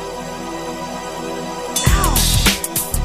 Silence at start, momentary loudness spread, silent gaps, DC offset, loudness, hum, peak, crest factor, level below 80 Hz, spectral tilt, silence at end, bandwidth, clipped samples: 0 s; 13 LU; none; under 0.1%; -18 LUFS; none; 0 dBFS; 18 dB; -24 dBFS; -3 dB/octave; 0 s; 15.5 kHz; under 0.1%